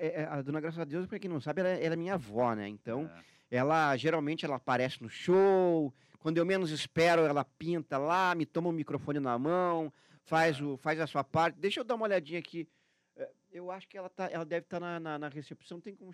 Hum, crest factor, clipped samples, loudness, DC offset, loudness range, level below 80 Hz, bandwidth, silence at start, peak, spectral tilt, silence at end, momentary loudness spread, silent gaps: none; 18 dB; under 0.1%; -32 LUFS; under 0.1%; 8 LU; -76 dBFS; 13 kHz; 0 s; -16 dBFS; -6 dB/octave; 0 s; 16 LU; none